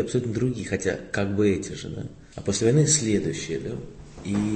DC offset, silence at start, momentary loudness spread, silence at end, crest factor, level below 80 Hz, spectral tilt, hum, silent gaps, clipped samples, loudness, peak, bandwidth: under 0.1%; 0 s; 17 LU; 0 s; 18 dB; -48 dBFS; -5 dB/octave; none; none; under 0.1%; -25 LUFS; -6 dBFS; 8.8 kHz